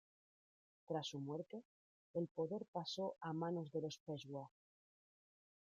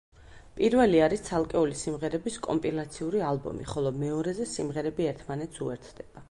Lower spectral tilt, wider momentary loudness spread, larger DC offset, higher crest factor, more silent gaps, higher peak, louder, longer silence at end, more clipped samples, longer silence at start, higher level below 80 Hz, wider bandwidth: about the same, -6 dB/octave vs -6 dB/octave; second, 9 LU vs 13 LU; neither; about the same, 18 dB vs 18 dB; first, 1.65-2.14 s, 2.31-2.35 s, 2.68-2.73 s, 4.00-4.06 s vs none; second, -30 dBFS vs -10 dBFS; second, -47 LUFS vs -29 LUFS; first, 1.2 s vs 0.05 s; neither; first, 0.9 s vs 0.2 s; second, -88 dBFS vs -52 dBFS; second, 7.6 kHz vs 11.5 kHz